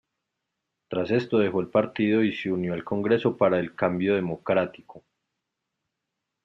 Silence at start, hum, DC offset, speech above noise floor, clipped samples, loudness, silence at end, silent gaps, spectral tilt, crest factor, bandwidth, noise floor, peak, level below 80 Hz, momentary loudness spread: 0.9 s; none; under 0.1%; 59 dB; under 0.1%; -25 LUFS; 1.45 s; none; -8.5 dB/octave; 18 dB; 7 kHz; -83 dBFS; -8 dBFS; -66 dBFS; 6 LU